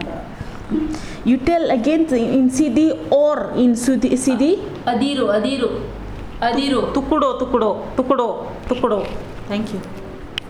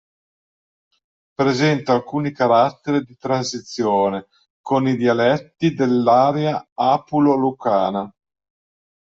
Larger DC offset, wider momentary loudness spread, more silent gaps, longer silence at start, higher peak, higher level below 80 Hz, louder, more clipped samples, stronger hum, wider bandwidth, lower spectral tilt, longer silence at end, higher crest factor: neither; first, 14 LU vs 8 LU; second, none vs 4.50-4.64 s, 6.72-6.76 s; second, 0 s vs 1.4 s; about the same, -2 dBFS vs -2 dBFS; first, -38 dBFS vs -62 dBFS; about the same, -18 LUFS vs -19 LUFS; neither; neither; first, 12.5 kHz vs 7.8 kHz; about the same, -5.5 dB/octave vs -6 dB/octave; second, 0 s vs 1.1 s; about the same, 16 dB vs 18 dB